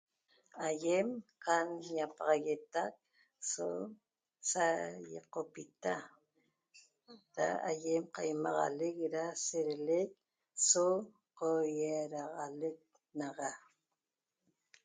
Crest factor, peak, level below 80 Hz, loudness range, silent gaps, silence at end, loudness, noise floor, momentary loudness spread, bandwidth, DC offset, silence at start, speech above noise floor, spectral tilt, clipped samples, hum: 22 dB; -16 dBFS; -88 dBFS; 6 LU; none; 1.25 s; -37 LUFS; under -90 dBFS; 11 LU; 9.4 kHz; under 0.1%; 0.55 s; over 53 dB; -3 dB/octave; under 0.1%; none